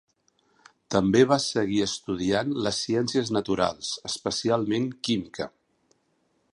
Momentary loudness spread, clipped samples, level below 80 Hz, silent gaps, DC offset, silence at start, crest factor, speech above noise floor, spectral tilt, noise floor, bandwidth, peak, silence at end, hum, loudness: 9 LU; under 0.1%; -56 dBFS; none; under 0.1%; 0.9 s; 20 dB; 45 dB; -4.5 dB/octave; -70 dBFS; 11.5 kHz; -6 dBFS; 1.05 s; none; -26 LUFS